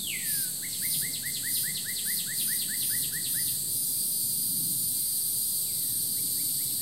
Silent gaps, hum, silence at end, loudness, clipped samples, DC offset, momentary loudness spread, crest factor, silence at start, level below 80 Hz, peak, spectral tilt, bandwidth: none; none; 0 s; -27 LUFS; under 0.1%; 0.2%; 2 LU; 14 dB; 0 s; -64 dBFS; -16 dBFS; 0.5 dB/octave; 16 kHz